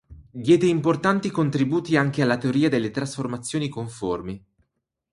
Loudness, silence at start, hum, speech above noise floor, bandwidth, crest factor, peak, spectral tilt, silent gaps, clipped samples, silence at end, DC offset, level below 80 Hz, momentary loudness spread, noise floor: -23 LUFS; 0.1 s; none; 55 dB; 11.5 kHz; 18 dB; -4 dBFS; -6.5 dB/octave; none; under 0.1%; 0.75 s; under 0.1%; -56 dBFS; 11 LU; -77 dBFS